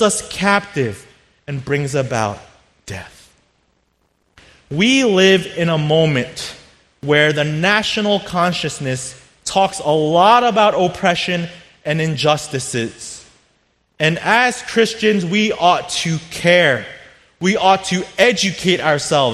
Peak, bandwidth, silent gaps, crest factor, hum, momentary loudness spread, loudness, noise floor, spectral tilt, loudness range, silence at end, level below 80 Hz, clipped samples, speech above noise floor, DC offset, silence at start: 0 dBFS; 13.5 kHz; none; 18 dB; none; 16 LU; -16 LUFS; -63 dBFS; -4 dB/octave; 6 LU; 0 s; -52 dBFS; under 0.1%; 47 dB; under 0.1%; 0 s